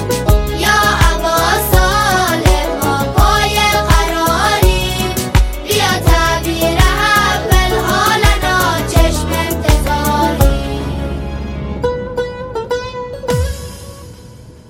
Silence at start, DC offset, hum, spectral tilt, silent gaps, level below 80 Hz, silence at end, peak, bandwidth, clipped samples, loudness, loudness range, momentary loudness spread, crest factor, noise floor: 0 s; under 0.1%; none; -4 dB/octave; none; -18 dBFS; 0.2 s; 0 dBFS; 17 kHz; under 0.1%; -14 LUFS; 7 LU; 11 LU; 14 dB; -36 dBFS